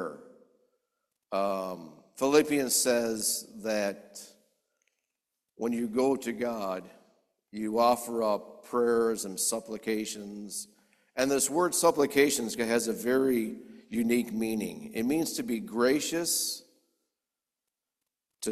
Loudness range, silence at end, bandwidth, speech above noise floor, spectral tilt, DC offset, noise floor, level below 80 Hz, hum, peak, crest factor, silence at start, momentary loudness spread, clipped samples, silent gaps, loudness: 6 LU; 0 s; 15 kHz; 60 dB; -3 dB/octave; under 0.1%; -89 dBFS; -68 dBFS; none; -8 dBFS; 22 dB; 0 s; 14 LU; under 0.1%; none; -29 LUFS